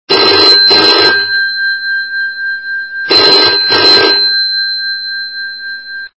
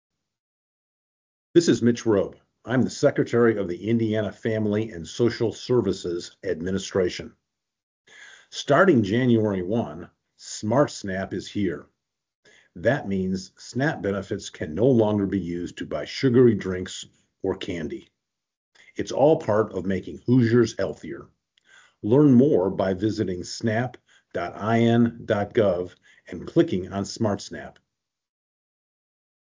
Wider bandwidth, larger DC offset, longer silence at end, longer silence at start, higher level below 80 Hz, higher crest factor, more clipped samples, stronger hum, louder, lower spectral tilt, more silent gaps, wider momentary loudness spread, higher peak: about the same, 8 kHz vs 7.6 kHz; first, 0.4% vs under 0.1%; second, 0.1 s vs 1.75 s; second, 0.1 s vs 1.55 s; about the same, -50 dBFS vs -52 dBFS; second, 10 dB vs 20 dB; first, 0.8% vs under 0.1%; neither; first, -7 LUFS vs -24 LUFS; second, -2.5 dB/octave vs -6.5 dB/octave; second, none vs 7.83-8.05 s, 12.35-12.43 s, 18.57-18.72 s; about the same, 14 LU vs 15 LU; first, 0 dBFS vs -4 dBFS